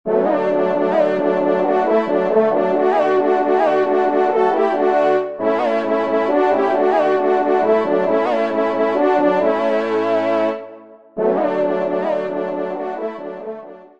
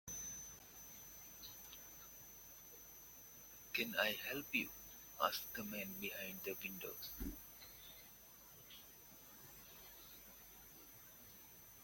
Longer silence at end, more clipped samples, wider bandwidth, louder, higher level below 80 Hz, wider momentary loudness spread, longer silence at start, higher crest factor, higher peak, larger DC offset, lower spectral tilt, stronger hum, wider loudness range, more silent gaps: first, 0.15 s vs 0 s; neither; second, 7.4 kHz vs 17 kHz; first, -17 LUFS vs -46 LUFS; about the same, -66 dBFS vs -66 dBFS; second, 8 LU vs 17 LU; about the same, 0.05 s vs 0.05 s; second, 14 dB vs 30 dB; first, -4 dBFS vs -20 dBFS; first, 0.4% vs under 0.1%; first, -7 dB/octave vs -2 dB/octave; neither; second, 4 LU vs 15 LU; neither